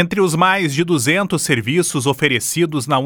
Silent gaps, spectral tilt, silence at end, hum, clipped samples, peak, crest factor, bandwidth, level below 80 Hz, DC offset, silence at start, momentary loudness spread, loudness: none; -4 dB/octave; 0 s; none; under 0.1%; 0 dBFS; 16 dB; over 20 kHz; -54 dBFS; under 0.1%; 0 s; 3 LU; -16 LUFS